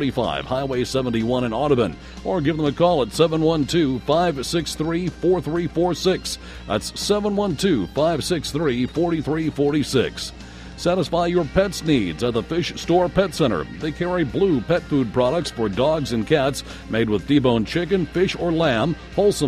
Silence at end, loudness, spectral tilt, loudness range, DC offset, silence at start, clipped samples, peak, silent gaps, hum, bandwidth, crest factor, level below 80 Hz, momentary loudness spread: 0 s; -21 LUFS; -5.5 dB/octave; 2 LU; under 0.1%; 0 s; under 0.1%; -4 dBFS; none; none; 15.5 kHz; 18 dB; -40 dBFS; 6 LU